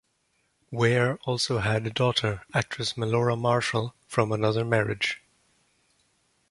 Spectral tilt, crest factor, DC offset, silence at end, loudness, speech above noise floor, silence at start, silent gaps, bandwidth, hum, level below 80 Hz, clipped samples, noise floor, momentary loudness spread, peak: -5 dB/octave; 20 dB; under 0.1%; 1.35 s; -26 LUFS; 46 dB; 0.7 s; none; 11.5 kHz; none; -56 dBFS; under 0.1%; -72 dBFS; 5 LU; -6 dBFS